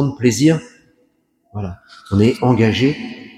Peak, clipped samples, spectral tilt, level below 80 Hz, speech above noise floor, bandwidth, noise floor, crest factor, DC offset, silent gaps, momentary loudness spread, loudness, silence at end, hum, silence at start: 0 dBFS; under 0.1%; -6 dB/octave; -48 dBFS; 45 dB; 15 kHz; -61 dBFS; 18 dB; under 0.1%; none; 16 LU; -16 LUFS; 0.1 s; none; 0 s